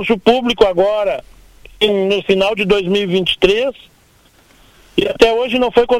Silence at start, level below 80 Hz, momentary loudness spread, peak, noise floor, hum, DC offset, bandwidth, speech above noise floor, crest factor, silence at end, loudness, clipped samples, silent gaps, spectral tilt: 0 s; -40 dBFS; 6 LU; 0 dBFS; -50 dBFS; none; under 0.1%; 15 kHz; 36 dB; 16 dB; 0 s; -14 LUFS; under 0.1%; none; -5 dB/octave